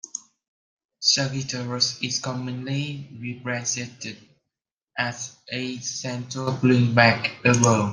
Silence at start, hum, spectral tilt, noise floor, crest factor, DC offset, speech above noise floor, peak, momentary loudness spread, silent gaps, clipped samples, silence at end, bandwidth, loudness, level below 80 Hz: 0.05 s; none; -4 dB/octave; -86 dBFS; 24 dB; under 0.1%; 62 dB; -2 dBFS; 17 LU; 0.48-0.77 s, 0.85-0.89 s, 4.77-4.88 s; under 0.1%; 0 s; 10 kHz; -23 LUFS; -64 dBFS